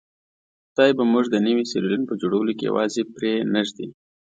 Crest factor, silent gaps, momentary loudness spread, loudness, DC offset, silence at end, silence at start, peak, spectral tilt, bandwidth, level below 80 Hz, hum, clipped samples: 20 dB; none; 9 LU; -22 LUFS; under 0.1%; 0.3 s; 0.8 s; -2 dBFS; -5.5 dB/octave; 9 kHz; -68 dBFS; none; under 0.1%